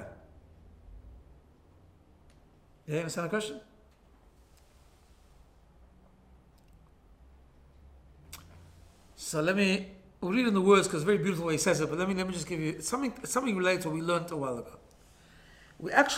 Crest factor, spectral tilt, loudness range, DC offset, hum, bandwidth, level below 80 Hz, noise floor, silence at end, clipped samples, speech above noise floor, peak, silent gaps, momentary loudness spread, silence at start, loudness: 26 dB; -4.5 dB/octave; 13 LU; under 0.1%; none; 16.5 kHz; -60 dBFS; -60 dBFS; 0 s; under 0.1%; 31 dB; -8 dBFS; none; 22 LU; 0 s; -30 LUFS